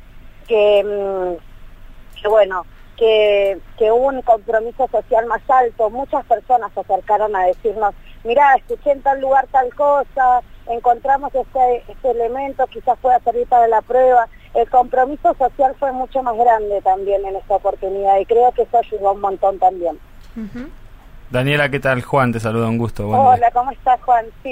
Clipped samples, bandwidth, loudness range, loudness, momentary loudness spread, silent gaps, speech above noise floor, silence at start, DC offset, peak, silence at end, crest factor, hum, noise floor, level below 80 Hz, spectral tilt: under 0.1%; 15.5 kHz; 3 LU; -16 LUFS; 8 LU; none; 22 dB; 0 s; under 0.1%; -2 dBFS; 0 s; 14 dB; none; -37 dBFS; -40 dBFS; -6.5 dB/octave